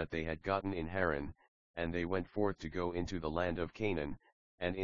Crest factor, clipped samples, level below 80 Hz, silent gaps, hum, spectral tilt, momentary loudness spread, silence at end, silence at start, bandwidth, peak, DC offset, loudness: 22 dB; under 0.1%; -54 dBFS; 1.48-1.74 s, 4.32-4.58 s; none; -5 dB/octave; 6 LU; 0 s; 0 s; 7 kHz; -16 dBFS; 0.2%; -38 LUFS